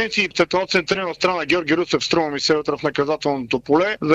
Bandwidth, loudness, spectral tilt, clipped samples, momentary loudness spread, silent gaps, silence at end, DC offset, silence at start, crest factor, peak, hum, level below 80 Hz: 9.6 kHz; -20 LUFS; -4 dB/octave; under 0.1%; 4 LU; none; 0 s; under 0.1%; 0 s; 16 dB; -4 dBFS; none; -54 dBFS